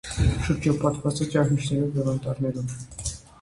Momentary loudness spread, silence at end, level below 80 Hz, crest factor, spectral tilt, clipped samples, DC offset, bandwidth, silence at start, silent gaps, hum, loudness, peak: 10 LU; 0.2 s; -36 dBFS; 16 dB; -6 dB/octave; under 0.1%; under 0.1%; 11.5 kHz; 0.05 s; none; none; -26 LUFS; -8 dBFS